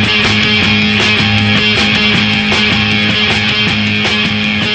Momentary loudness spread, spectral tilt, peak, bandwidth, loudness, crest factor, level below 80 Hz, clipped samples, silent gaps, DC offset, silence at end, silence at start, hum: 2 LU; -4 dB/octave; 0 dBFS; 9.2 kHz; -9 LUFS; 10 dB; -34 dBFS; under 0.1%; none; 0.1%; 0 s; 0 s; none